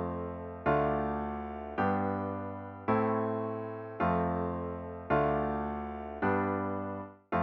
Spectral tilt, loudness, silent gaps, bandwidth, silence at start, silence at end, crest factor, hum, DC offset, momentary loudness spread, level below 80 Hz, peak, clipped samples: -10.5 dB/octave; -33 LUFS; none; 5.6 kHz; 0 s; 0 s; 18 dB; none; under 0.1%; 10 LU; -52 dBFS; -14 dBFS; under 0.1%